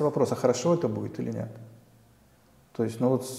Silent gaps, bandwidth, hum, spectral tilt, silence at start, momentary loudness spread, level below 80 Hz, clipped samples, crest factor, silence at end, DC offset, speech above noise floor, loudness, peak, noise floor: none; 15 kHz; none; -6.5 dB/octave; 0 s; 15 LU; -68 dBFS; under 0.1%; 20 dB; 0 s; under 0.1%; 32 dB; -28 LUFS; -8 dBFS; -60 dBFS